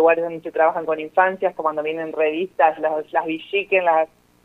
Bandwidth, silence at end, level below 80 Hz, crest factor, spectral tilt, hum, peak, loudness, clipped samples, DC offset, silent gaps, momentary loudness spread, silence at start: 4.1 kHz; 0.4 s; -68 dBFS; 18 dB; -6.5 dB/octave; none; -2 dBFS; -21 LUFS; under 0.1%; under 0.1%; none; 7 LU; 0 s